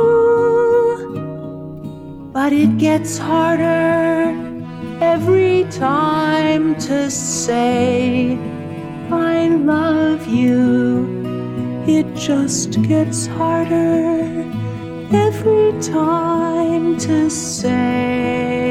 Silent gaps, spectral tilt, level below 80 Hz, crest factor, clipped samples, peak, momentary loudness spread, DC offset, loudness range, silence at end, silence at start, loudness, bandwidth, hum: none; -5.5 dB/octave; -48 dBFS; 14 dB; under 0.1%; -2 dBFS; 12 LU; under 0.1%; 2 LU; 0 s; 0 s; -16 LUFS; 14.5 kHz; none